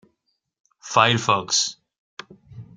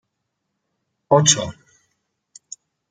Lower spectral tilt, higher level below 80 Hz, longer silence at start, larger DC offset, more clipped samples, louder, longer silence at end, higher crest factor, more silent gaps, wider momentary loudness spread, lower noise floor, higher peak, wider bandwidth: about the same, -2.5 dB/octave vs -3 dB/octave; second, -64 dBFS vs -58 dBFS; second, 0.85 s vs 1.1 s; neither; neither; second, -20 LUFS vs -16 LUFS; second, 0.15 s vs 1.4 s; about the same, 24 dB vs 24 dB; first, 1.98-2.17 s vs none; about the same, 24 LU vs 26 LU; about the same, -75 dBFS vs -77 dBFS; about the same, 0 dBFS vs 0 dBFS; about the same, 9.6 kHz vs 10 kHz